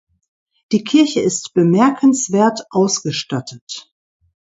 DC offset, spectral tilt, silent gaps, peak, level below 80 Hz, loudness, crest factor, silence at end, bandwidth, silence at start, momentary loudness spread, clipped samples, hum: under 0.1%; -4.5 dB/octave; 3.61-3.67 s; 0 dBFS; -62 dBFS; -16 LUFS; 16 dB; 0.8 s; 8 kHz; 0.7 s; 15 LU; under 0.1%; none